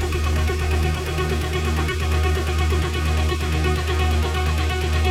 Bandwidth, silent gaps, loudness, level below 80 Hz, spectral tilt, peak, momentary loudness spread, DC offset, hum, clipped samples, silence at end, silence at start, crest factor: 15 kHz; none; -22 LUFS; -24 dBFS; -5.5 dB/octave; -8 dBFS; 2 LU; under 0.1%; none; under 0.1%; 0 s; 0 s; 12 dB